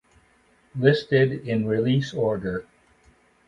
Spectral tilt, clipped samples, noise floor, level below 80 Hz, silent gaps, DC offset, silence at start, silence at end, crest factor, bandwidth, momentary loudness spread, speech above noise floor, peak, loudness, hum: -7.5 dB/octave; under 0.1%; -61 dBFS; -56 dBFS; none; under 0.1%; 0.75 s; 0.85 s; 22 dB; 7.6 kHz; 11 LU; 38 dB; -4 dBFS; -23 LUFS; none